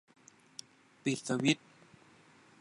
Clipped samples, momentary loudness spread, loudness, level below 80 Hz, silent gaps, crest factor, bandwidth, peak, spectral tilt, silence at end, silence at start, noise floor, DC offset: under 0.1%; 20 LU; -33 LUFS; -82 dBFS; none; 24 dB; 11.5 kHz; -14 dBFS; -4.5 dB/octave; 1.05 s; 1.05 s; -62 dBFS; under 0.1%